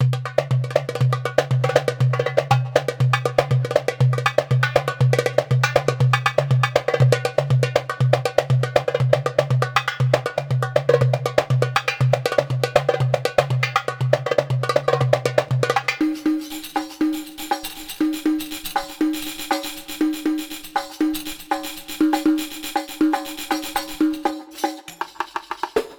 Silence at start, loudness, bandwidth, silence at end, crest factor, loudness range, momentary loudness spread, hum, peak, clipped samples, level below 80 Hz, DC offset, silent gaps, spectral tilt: 0 s; -21 LUFS; 19.5 kHz; 0.05 s; 20 dB; 5 LU; 8 LU; none; 0 dBFS; under 0.1%; -52 dBFS; under 0.1%; none; -6 dB/octave